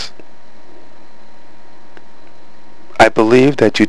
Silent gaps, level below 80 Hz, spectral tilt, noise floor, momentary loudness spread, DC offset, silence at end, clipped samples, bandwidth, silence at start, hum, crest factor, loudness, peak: none; -46 dBFS; -5.5 dB/octave; -46 dBFS; 19 LU; 8%; 0 s; 0.1%; 11 kHz; 0 s; none; 16 dB; -11 LUFS; 0 dBFS